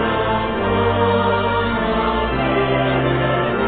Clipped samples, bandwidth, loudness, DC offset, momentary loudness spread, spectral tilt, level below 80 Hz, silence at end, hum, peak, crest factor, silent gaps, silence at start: under 0.1%; 4.6 kHz; -18 LUFS; under 0.1%; 3 LU; -11 dB/octave; -34 dBFS; 0 s; none; -4 dBFS; 14 dB; none; 0 s